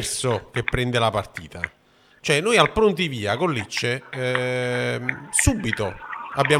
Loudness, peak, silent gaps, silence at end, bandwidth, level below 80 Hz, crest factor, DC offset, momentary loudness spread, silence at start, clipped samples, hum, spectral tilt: -23 LUFS; -2 dBFS; none; 0 s; 16 kHz; -42 dBFS; 20 dB; under 0.1%; 13 LU; 0 s; under 0.1%; none; -4 dB/octave